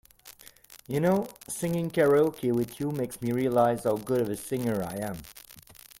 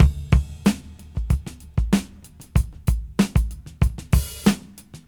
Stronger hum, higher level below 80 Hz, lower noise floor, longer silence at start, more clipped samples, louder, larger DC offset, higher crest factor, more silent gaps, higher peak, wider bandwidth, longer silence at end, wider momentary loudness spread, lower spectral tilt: neither; second, -60 dBFS vs -26 dBFS; first, -53 dBFS vs -44 dBFS; first, 0.25 s vs 0 s; neither; second, -28 LUFS vs -24 LUFS; neither; about the same, 18 dB vs 20 dB; neither; second, -10 dBFS vs 0 dBFS; second, 17 kHz vs 19.5 kHz; first, 0.4 s vs 0.1 s; first, 18 LU vs 12 LU; about the same, -6.5 dB/octave vs -6 dB/octave